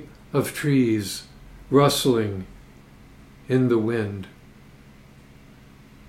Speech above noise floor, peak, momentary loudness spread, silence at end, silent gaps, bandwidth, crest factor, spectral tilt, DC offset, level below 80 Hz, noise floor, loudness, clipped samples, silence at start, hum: 27 dB; -4 dBFS; 17 LU; 1.8 s; none; 16 kHz; 20 dB; -5.5 dB/octave; under 0.1%; -52 dBFS; -48 dBFS; -22 LUFS; under 0.1%; 0 s; none